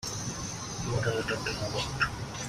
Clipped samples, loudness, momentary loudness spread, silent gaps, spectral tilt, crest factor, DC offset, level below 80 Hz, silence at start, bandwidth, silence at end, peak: under 0.1%; -32 LUFS; 6 LU; none; -3.5 dB/octave; 18 dB; under 0.1%; -48 dBFS; 0 s; 15.5 kHz; 0 s; -14 dBFS